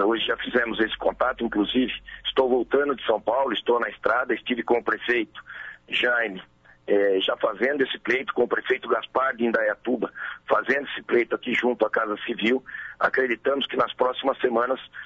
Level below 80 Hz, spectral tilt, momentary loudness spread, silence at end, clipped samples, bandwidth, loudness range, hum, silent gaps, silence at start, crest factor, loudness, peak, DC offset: -58 dBFS; -5.5 dB/octave; 5 LU; 0 s; under 0.1%; 7.4 kHz; 1 LU; none; none; 0 s; 16 dB; -24 LUFS; -8 dBFS; under 0.1%